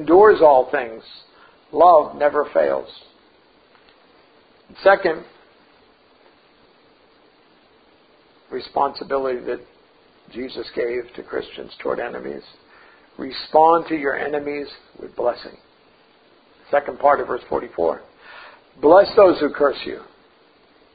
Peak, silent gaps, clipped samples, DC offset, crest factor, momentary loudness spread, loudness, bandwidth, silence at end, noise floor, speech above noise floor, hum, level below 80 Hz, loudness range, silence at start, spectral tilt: 0 dBFS; none; under 0.1%; under 0.1%; 20 dB; 21 LU; -18 LUFS; 5 kHz; 0.95 s; -55 dBFS; 36 dB; none; -56 dBFS; 11 LU; 0 s; -9.5 dB/octave